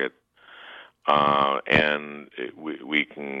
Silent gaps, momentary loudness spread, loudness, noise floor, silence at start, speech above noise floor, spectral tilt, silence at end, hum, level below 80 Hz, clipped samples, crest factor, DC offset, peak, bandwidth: none; 19 LU; -23 LUFS; -52 dBFS; 0 s; 28 dB; -6 dB/octave; 0 s; none; -56 dBFS; under 0.1%; 20 dB; under 0.1%; -4 dBFS; 8 kHz